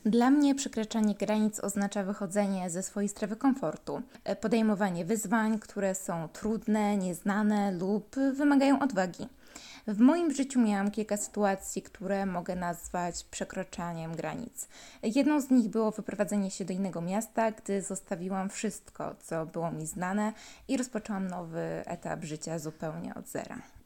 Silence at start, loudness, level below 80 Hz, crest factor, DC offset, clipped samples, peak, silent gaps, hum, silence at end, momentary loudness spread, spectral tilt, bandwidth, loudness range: 0.05 s; -31 LUFS; -62 dBFS; 18 dB; under 0.1%; under 0.1%; -14 dBFS; none; none; 0.05 s; 12 LU; -5.5 dB/octave; 17 kHz; 7 LU